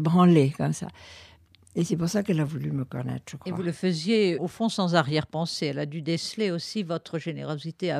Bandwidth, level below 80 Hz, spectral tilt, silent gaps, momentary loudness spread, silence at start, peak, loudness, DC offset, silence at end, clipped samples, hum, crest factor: 13.5 kHz; -64 dBFS; -6 dB/octave; none; 12 LU; 0 s; -6 dBFS; -27 LUFS; under 0.1%; 0 s; under 0.1%; none; 20 dB